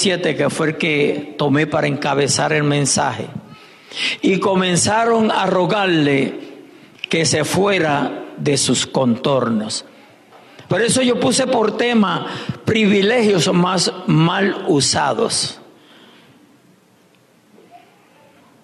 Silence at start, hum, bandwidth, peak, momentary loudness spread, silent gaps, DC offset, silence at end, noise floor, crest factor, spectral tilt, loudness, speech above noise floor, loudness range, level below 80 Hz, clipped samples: 0 s; none; 12.5 kHz; -6 dBFS; 9 LU; none; under 0.1%; 0.85 s; -53 dBFS; 12 dB; -4 dB/octave; -17 LUFS; 36 dB; 3 LU; -60 dBFS; under 0.1%